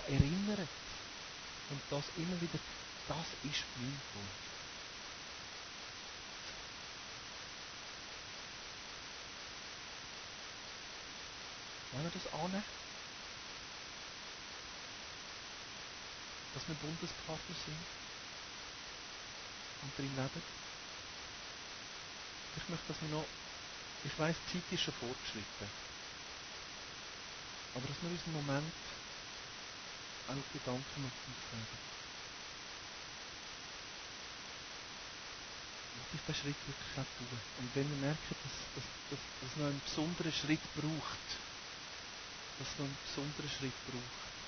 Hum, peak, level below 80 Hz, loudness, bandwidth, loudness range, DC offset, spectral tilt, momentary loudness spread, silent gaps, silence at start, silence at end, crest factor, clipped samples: none; -16 dBFS; -62 dBFS; -44 LUFS; 6.6 kHz; 6 LU; under 0.1%; -4 dB/octave; 8 LU; none; 0 s; 0 s; 28 dB; under 0.1%